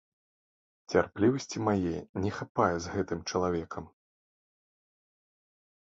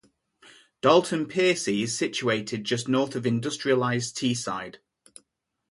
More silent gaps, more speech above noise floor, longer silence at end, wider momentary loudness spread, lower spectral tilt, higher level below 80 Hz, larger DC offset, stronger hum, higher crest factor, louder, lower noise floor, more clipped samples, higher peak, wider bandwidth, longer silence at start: first, 2.09-2.14 s, 2.49-2.55 s vs none; first, over 60 dB vs 50 dB; first, 2.05 s vs 0.95 s; about the same, 7 LU vs 8 LU; first, -6 dB/octave vs -4.5 dB/octave; first, -54 dBFS vs -68 dBFS; neither; neither; about the same, 22 dB vs 20 dB; second, -31 LUFS vs -25 LUFS; first, under -90 dBFS vs -75 dBFS; neither; second, -10 dBFS vs -6 dBFS; second, 8 kHz vs 11.5 kHz; about the same, 0.9 s vs 0.85 s